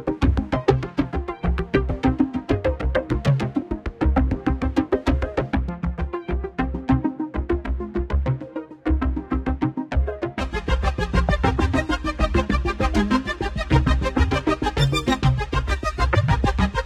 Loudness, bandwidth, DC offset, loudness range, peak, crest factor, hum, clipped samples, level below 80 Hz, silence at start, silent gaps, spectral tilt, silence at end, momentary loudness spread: -23 LUFS; 11 kHz; under 0.1%; 4 LU; -4 dBFS; 18 dB; none; under 0.1%; -26 dBFS; 0 s; none; -7 dB/octave; 0 s; 7 LU